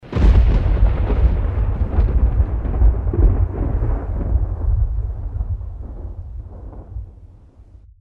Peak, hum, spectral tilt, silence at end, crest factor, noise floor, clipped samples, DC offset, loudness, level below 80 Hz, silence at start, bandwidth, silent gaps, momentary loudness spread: -4 dBFS; none; -10 dB/octave; 0.4 s; 12 dB; -44 dBFS; under 0.1%; under 0.1%; -20 LUFS; -18 dBFS; 0.05 s; 4.2 kHz; none; 17 LU